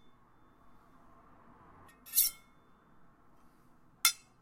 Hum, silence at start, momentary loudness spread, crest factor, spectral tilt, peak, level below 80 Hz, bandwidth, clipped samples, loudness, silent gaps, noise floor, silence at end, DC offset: none; 2.05 s; 27 LU; 32 dB; 2 dB/octave; -8 dBFS; -72 dBFS; 16.5 kHz; under 0.1%; -30 LUFS; none; -63 dBFS; 0.3 s; under 0.1%